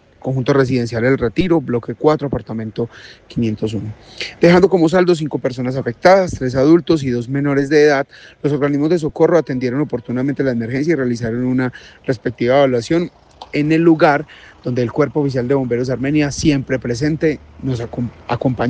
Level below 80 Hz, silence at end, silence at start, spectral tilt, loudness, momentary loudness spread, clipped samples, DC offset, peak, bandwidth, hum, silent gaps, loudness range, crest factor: -44 dBFS; 0 s; 0.25 s; -7 dB/octave; -16 LUFS; 12 LU; under 0.1%; under 0.1%; 0 dBFS; 9.2 kHz; none; none; 4 LU; 16 dB